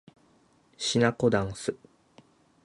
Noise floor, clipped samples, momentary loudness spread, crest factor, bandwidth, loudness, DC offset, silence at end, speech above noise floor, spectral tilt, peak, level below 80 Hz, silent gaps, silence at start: -63 dBFS; under 0.1%; 12 LU; 24 dB; 11.5 kHz; -27 LUFS; under 0.1%; 0.9 s; 37 dB; -4.5 dB/octave; -8 dBFS; -58 dBFS; none; 0.8 s